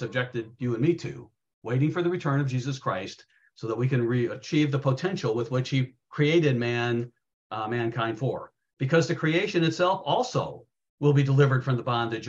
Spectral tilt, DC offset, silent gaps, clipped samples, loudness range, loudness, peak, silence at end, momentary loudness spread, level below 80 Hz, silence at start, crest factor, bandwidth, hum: -7 dB/octave; under 0.1%; 1.54-1.62 s, 7.33-7.50 s, 8.73-8.77 s, 10.90-10.98 s; under 0.1%; 4 LU; -26 LUFS; -8 dBFS; 0 s; 11 LU; -66 dBFS; 0 s; 20 dB; 7.6 kHz; none